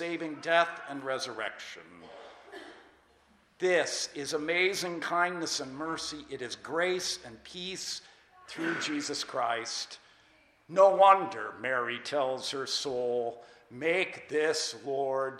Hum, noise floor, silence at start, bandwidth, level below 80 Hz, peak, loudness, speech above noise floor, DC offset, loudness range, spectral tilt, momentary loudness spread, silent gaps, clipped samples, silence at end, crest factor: none; -65 dBFS; 0 s; 15.5 kHz; -72 dBFS; -8 dBFS; -30 LUFS; 34 dB; under 0.1%; 8 LU; -2.5 dB/octave; 18 LU; none; under 0.1%; 0 s; 24 dB